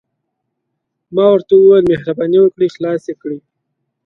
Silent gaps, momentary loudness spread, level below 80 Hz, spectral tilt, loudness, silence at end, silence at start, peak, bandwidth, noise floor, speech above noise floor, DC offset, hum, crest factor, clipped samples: none; 17 LU; -54 dBFS; -8.5 dB/octave; -12 LUFS; 0.7 s; 1.1 s; 0 dBFS; 6 kHz; -74 dBFS; 62 dB; under 0.1%; none; 14 dB; under 0.1%